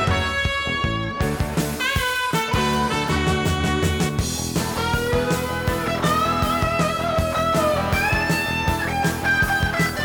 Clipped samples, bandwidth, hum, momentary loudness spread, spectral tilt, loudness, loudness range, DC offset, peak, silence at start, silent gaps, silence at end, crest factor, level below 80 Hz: under 0.1%; over 20 kHz; none; 4 LU; -4.5 dB/octave; -21 LUFS; 1 LU; under 0.1%; -8 dBFS; 0 s; none; 0 s; 14 dB; -34 dBFS